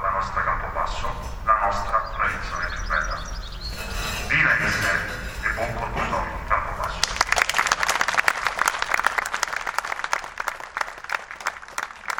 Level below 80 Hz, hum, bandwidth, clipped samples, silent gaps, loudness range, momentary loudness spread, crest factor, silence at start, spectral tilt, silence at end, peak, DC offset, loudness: -36 dBFS; none; 17.5 kHz; under 0.1%; none; 4 LU; 10 LU; 24 dB; 0 s; -2 dB/octave; 0 s; 0 dBFS; under 0.1%; -24 LUFS